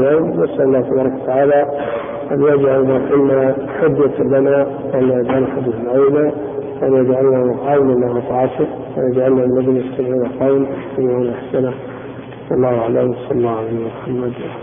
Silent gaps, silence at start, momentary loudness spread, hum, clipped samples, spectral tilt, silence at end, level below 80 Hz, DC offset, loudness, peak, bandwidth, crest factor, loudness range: none; 0 s; 9 LU; none; under 0.1%; -13.5 dB/octave; 0 s; -48 dBFS; under 0.1%; -16 LUFS; -2 dBFS; 3.7 kHz; 12 dB; 4 LU